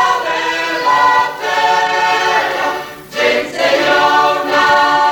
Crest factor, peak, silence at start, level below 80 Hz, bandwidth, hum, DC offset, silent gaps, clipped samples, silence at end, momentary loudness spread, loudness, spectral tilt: 12 dB; -2 dBFS; 0 s; -52 dBFS; 20 kHz; none; under 0.1%; none; under 0.1%; 0 s; 6 LU; -13 LUFS; -2 dB/octave